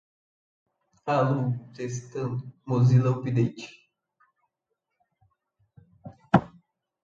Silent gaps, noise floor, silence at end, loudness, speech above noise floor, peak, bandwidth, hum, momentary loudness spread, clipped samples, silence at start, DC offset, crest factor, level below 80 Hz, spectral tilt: none; -82 dBFS; 0.55 s; -26 LUFS; 57 dB; -4 dBFS; 7.4 kHz; none; 15 LU; under 0.1%; 1.05 s; under 0.1%; 26 dB; -60 dBFS; -8 dB/octave